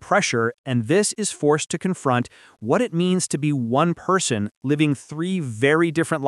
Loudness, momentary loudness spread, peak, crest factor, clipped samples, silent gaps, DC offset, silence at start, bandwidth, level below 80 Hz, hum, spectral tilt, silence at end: -21 LUFS; 6 LU; -4 dBFS; 16 dB; under 0.1%; 0.58-0.64 s, 4.57-4.61 s; under 0.1%; 0 s; 12.5 kHz; -64 dBFS; none; -5 dB/octave; 0 s